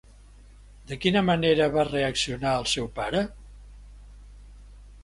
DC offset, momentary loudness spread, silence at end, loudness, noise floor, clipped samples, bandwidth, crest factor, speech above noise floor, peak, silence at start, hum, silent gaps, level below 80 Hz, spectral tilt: under 0.1%; 7 LU; 0 s; -25 LUFS; -50 dBFS; under 0.1%; 11.5 kHz; 20 dB; 25 dB; -6 dBFS; 0.85 s; 50 Hz at -45 dBFS; none; -46 dBFS; -4.5 dB/octave